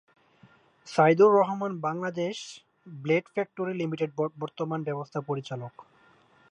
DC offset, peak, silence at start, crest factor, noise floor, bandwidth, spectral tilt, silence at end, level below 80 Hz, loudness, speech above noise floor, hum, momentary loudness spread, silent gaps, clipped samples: under 0.1%; -8 dBFS; 0.85 s; 20 dB; -60 dBFS; 10 kHz; -6.5 dB/octave; 0.7 s; -78 dBFS; -27 LUFS; 33 dB; none; 19 LU; none; under 0.1%